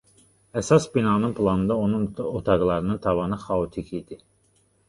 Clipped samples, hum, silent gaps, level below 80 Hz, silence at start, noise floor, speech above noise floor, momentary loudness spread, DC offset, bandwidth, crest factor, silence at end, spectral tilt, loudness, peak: under 0.1%; none; none; -46 dBFS; 0.55 s; -64 dBFS; 41 dB; 13 LU; under 0.1%; 11.5 kHz; 20 dB; 0.7 s; -7 dB/octave; -24 LUFS; -6 dBFS